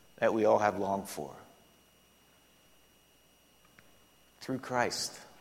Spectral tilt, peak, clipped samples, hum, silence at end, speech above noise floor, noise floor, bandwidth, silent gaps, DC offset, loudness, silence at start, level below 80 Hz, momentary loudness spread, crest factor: -4 dB/octave; -12 dBFS; under 0.1%; none; 0.15 s; 34 dB; -65 dBFS; 16.5 kHz; none; under 0.1%; -32 LUFS; 0.2 s; -72 dBFS; 18 LU; 24 dB